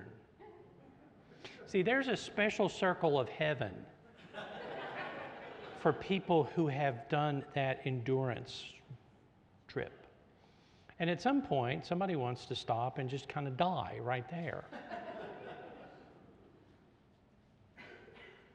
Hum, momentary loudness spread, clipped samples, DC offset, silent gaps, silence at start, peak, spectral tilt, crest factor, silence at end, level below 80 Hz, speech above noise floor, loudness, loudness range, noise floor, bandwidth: none; 22 LU; under 0.1%; under 0.1%; none; 0 s; -16 dBFS; -6.5 dB/octave; 22 dB; 0.15 s; -72 dBFS; 32 dB; -36 LUFS; 10 LU; -67 dBFS; 9.4 kHz